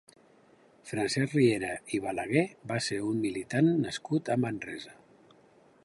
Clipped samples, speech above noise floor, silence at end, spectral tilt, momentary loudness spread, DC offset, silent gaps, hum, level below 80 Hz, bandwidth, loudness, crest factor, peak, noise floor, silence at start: under 0.1%; 31 dB; 0.9 s; -5.5 dB/octave; 12 LU; under 0.1%; none; none; -66 dBFS; 11.5 kHz; -30 LUFS; 18 dB; -12 dBFS; -61 dBFS; 0.85 s